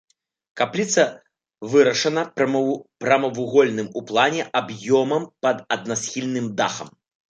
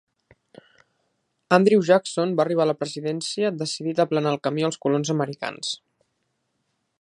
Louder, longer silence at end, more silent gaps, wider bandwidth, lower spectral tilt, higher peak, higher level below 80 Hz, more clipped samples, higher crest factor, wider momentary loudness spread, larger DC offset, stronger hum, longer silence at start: about the same, -21 LUFS vs -23 LUFS; second, 0.45 s vs 1.25 s; neither; second, 9.2 kHz vs 11 kHz; about the same, -4 dB/octave vs -5 dB/octave; about the same, -2 dBFS vs 0 dBFS; about the same, -70 dBFS vs -72 dBFS; neither; second, 18 dB vs 24 dB; second, 7 LU vs 11 LU; neither; neither; second, 0.55 s vs 1.5 s